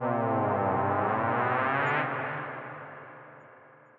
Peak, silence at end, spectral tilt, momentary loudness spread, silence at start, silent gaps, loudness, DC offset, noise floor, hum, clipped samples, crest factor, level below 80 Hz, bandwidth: -12 dBFS; 0.4 s; -5 dB/octave; 18 LU; 0 s; none; -28 LUFS; under 0.1%; -54 dBFS; none; under 0.1%; 18 dB; -76 dBFS; 7 kHz